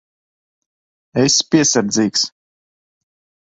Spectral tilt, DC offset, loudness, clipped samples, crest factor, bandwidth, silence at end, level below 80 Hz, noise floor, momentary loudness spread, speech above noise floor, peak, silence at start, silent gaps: -3 dB/octave; under 0.1%; -15 LUFS; under 0.1%; 18 dB; 8.4 kHz; 1.25 s; -58 dBFS; under -90 dBFS; 9 LU; over 75 dB; -2 dBFS; 1.15 s; none